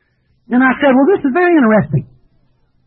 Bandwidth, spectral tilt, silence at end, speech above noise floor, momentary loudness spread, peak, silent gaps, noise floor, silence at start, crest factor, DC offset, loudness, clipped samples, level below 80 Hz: 4.2 kHz; -12.5 dB/octave; 0.8 s; 44 dB; 8 LU; -2 dBFS; none; -55 dBFS; 0.5 s; 12 dB; under 0.1%; -12 LUFS; under 0.1%; -50 dBFS